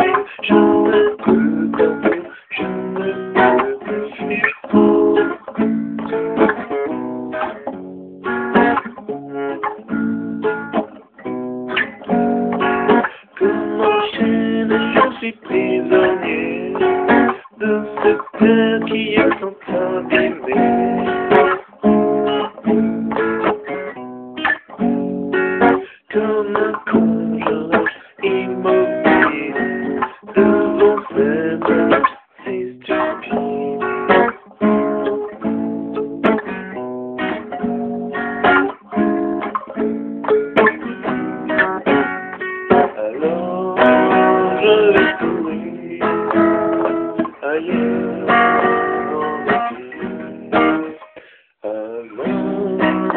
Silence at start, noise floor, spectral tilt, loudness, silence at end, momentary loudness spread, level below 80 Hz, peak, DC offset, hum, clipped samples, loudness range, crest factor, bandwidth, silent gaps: 0 s; -44 dBFS; -4 dB/octave; -17 LUFS; 0 s; 11 LU; -52 dBFS; 0 dBFS; under 0.1%; none; under 0.1%; 5 LU; 18 dB; 4.3 kHz; none